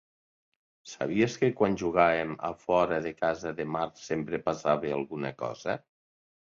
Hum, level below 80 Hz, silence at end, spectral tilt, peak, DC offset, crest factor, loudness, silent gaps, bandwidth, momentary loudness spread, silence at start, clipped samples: none; -62 dBFS; 0.7 s; -6 dB/octave; -8 dBFS; under 0.1%; 22 dB; -29 LUFS; none; 7.6 kHz; 10 LU; 0.85 s; under 0.1%